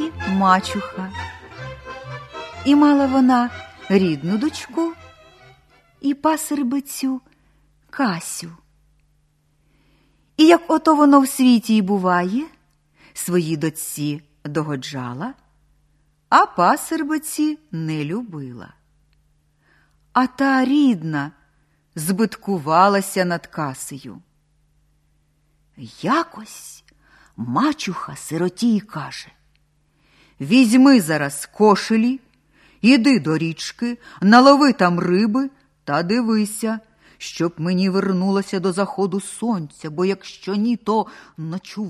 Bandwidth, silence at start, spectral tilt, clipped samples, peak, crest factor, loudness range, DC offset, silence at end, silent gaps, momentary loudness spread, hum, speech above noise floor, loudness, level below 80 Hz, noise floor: 13 kHz; 0 s; -5.5 dB/octave; under 0.1%; 0 dBFS; 20 dB; 9 LU; under 0.1%; 0 s; none; 19 LU; none; 44 dB; -19 LUFS; -58 dBFS; -62 dBFS